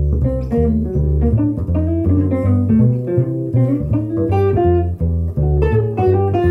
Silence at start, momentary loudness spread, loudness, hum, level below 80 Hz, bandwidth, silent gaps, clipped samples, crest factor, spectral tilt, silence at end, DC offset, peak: 0 s; 4 LU; -16 LUFS; none; -24 dBFS; 3.8 kHz; none; under 0.1%; 12 dB; -11.5 dB/octave; 0 s; under 0.1%; -4 dBFS